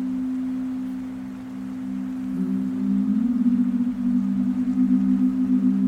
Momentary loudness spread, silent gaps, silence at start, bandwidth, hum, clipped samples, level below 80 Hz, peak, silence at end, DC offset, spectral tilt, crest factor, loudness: 11 LU; none; 0 s; 4.5 kHz; none; under 0.1%; -54 dBFS; -10 dBFS; 0 s; under 0.1%; -9 dB/octave; 12 dB; -24 LUFS